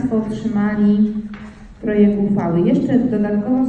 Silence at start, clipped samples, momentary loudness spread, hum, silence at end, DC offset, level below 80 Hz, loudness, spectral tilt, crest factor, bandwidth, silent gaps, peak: 0 s; under 0.1%; 12 LU; none; 0 s; under 0.1%; -44 dBFS; -17 LUFS; -9.5 dB/octave; 14 dB; 4.6 kHz; none; -2 dBFS